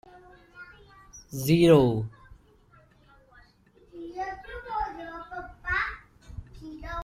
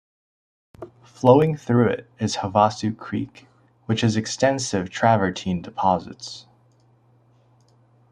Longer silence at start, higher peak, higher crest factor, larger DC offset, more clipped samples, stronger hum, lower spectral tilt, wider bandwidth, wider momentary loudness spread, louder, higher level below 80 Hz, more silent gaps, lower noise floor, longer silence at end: second, 0.15 s vs 0.8 s; second, -6 dBFS vs -2 dBFS; about the same, 24 dB vs 20 dB; neither; neither; neither; about the same, -6.5 dB/octave vs -5.5 dB/octave; first, 16 kHz vs 10.5 kHz; first, 28 LU vs 21 LU; second, -26 LUFS vs -21 LUFS; first, -50 dBFS vs -60 dBFS; neither; about the same, -59 dBFS vs -58 dBFS; second, 0 s vs 1.7 s